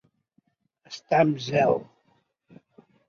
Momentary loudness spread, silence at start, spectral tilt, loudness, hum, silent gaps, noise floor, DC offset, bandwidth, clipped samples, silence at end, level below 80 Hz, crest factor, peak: 19 LU; 0.9 s; -6.5 dB/octave; -24 LUFS; none; none; -70 dBFS; under 0.1%; 7.2 kHz; under 0.1%; 1.25 s; -66 dBFS; 22 dB; -6 dBFS